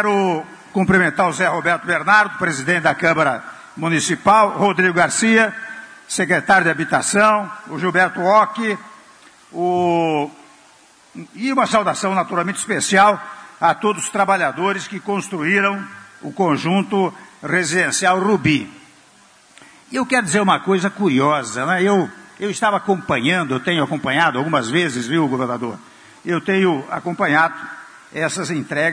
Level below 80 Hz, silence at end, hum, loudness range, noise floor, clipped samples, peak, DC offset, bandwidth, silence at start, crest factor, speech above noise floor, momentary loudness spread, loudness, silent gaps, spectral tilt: -58 dBFS; 0 s; none; 4 LU; -50 dBFS; under 0.1%; -2 dBFS; under 0.1%; 10.5 kHz; 0 s; 16 dB; 32 dB; 13 LU; -17 LUFS; none; -4 dB/octave